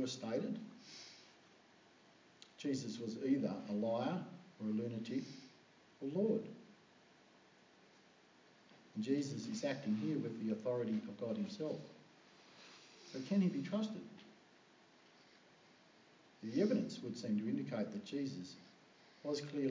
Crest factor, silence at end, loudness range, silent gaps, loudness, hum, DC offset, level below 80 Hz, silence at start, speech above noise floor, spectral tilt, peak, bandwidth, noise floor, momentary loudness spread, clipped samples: 20 dB; 0 s; 5 LU; none; -41 LUFS; none; under 0.1%; -90 dBFS; 0 s; 27 dB; -6.5 dB/octave; -24 dBFS; 7.6 kHz; -67 dBFS; 21 LU; under 0.1%